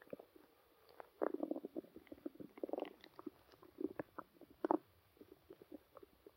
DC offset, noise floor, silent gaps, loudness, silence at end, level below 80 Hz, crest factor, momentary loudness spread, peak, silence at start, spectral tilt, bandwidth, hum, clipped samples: under 0.1%; -70 dBFS; none; -47 LUFS; 0.05 s; -82 dBFS; 32 dB; 23 LU; -16 dBFS; 0.1 s; -7 dB/octave; 16 kHz; none; under 0.1%